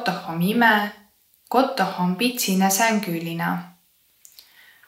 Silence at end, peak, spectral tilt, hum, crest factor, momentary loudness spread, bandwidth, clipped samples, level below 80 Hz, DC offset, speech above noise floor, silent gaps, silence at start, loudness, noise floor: 1.2 s; -4 dBFS; -4 dB/octave; none; 20 dB; 9 LU; 16.5 kHz; under 0.1%; -70 dBFS; under 0.1%; 40 dB; none; 0 s; -21 LUFS; -61 dBFS